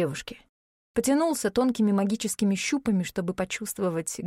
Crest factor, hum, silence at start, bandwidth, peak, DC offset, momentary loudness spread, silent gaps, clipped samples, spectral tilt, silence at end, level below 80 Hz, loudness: 16 dB; none; 0 s; 16 kHz; -12 dBFS; under 0.1%; 7 LU; 0.49-0.94 s; under 0.1%; -5 dB/octave; 0 s; -58 dBFS; -26 LUFS